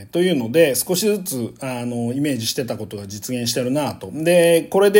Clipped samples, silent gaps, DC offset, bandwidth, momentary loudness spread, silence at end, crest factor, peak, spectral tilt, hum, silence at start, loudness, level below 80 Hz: under 0.1%; none; under 0.1%; 17 kHz; 12 LU; 0 s; 18 dB; 0 dBFS; -4.5 dB/octave; none; 0 s; -20 LUFS; -60 dBFS